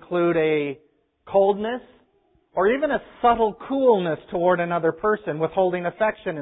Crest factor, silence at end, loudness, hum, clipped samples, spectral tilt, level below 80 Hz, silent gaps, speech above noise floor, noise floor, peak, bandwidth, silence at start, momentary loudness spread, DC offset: 16 dB; 0 s; -22 LUFS; none; under 0.1%; -11 dB/octave; -56 dBFS; none; 42 dB; -64 dBFS; -6 dBFS; 4 kHz; 0.1 s; 7 LU; under 0.1%